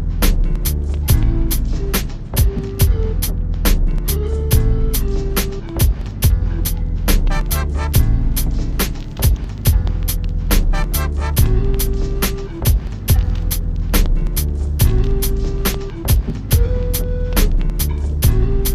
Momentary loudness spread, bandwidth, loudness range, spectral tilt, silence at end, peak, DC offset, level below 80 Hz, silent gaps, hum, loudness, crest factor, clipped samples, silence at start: 5 LU; 15.5 kHz; 1 LU; -5 dB/octave; 0 s; 0 dBFS; under 0.1%; -16 dBFS; none; none; -19 LUFS; 16 dB; under 0.1%; 0 s